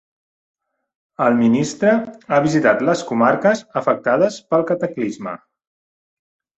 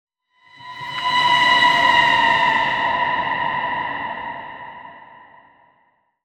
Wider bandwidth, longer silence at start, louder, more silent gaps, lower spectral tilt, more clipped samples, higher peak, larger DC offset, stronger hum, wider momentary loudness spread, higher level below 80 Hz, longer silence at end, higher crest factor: second, 8.2 kHz vs 13.5 kHz; first, 1.2 s vs 0.6 s; about the same, -18 LUFS vs -17 LUFS; neither; first, -6 dB/octave vs -2.5 dB/octave; neither; about the same, -2 dBFS vs -2 dBFS; neither; neither; second, 9 LU vs 21 LU; about the same, -60 dBFS vs -58 dBFS; about the same, 1.2 s vs 1.2 s; about the same, 16 dB vs 18 dB